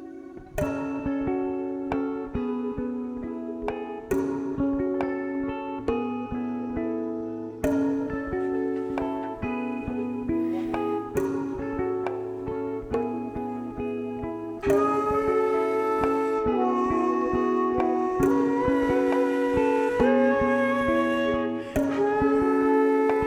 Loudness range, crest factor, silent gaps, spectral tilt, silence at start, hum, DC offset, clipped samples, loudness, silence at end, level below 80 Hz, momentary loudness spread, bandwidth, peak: 7 LU; 16 dB; none; -7 dB/octave; 0 s; none; under 0.1%; under 0.1%; -26 LUFS; 0 s; -48 dBFS; 9 LU; 14.5 kHz; -10 dBFS